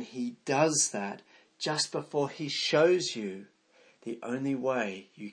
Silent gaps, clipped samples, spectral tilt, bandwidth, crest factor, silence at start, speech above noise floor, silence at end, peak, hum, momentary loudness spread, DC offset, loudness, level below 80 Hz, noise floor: none; under 0.1%; -3 dB/octave; 10.5 kHz; 20 dB; 0 s; 33 dB; 0 s; -12 dBFS; none; 16 LU; under 0.1%; -30 LUFS; -84 dBFS; -63 dBFS